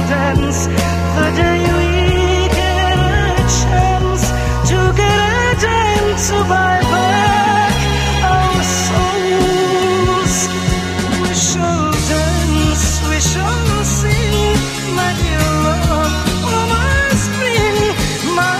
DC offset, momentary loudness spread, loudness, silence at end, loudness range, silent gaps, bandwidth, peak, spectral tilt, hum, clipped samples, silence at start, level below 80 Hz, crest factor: under 0.1%; 3 LU; -14 LUFS; 0 s; 2 LU; none; 16 kHz; 0 dBFS; -4.5 dB/octave; none; under 0.1%; 0 s; -22 dBFS; 14 dB